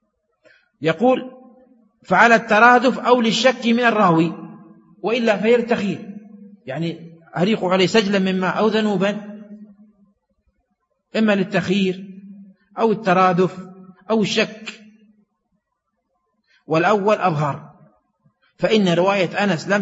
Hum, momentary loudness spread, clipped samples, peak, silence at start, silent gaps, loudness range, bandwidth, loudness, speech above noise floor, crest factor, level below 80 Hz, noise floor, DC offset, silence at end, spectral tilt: none; 19 LU; under 0.1%; 0 dBFS; 0.8 s; none; 8 LU; 8 kHz; -18 LUFS; 58 dB; 20 dB; -66 dBFS; -75 dBFS; under 0.1%; 0 s; -5.5 dB/octave